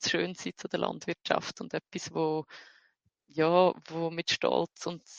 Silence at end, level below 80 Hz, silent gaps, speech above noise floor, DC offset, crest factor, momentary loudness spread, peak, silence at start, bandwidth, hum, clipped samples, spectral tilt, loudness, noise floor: 0 s; -74 dBFS; none; 41 dB; under 0.1%; 24 dB; 13 LU; -8 dBFS; 0 s; 9.2 kHz; none; under 0.1%; -4 dB/octave; -31 LUFS; -71 dBFS